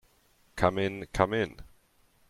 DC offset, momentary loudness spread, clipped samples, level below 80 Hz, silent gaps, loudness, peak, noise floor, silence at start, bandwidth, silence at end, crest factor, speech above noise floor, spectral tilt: under 0.1%; 8 LU; under 0.1%; -50 dBFS; none; -29 LUFS; -8 dBFS; -65 dBFS; 0.55 s; 15 kHz; 0.65 s; 24 dB; 37 dB; -6 dB/octave